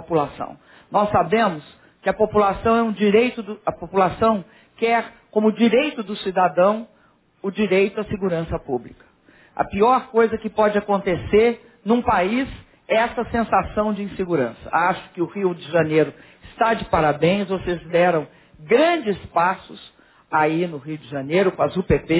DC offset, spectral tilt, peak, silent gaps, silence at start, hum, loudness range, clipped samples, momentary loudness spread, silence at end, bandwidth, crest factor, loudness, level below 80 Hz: under 0.1%; -10 dB/octave; -4 dBFS; none; 0 s; none; 2 LU; under 0.1%; 10 LU; 0 s; 4 kHz; 18 dB; -21 LUFS; -44 dBFS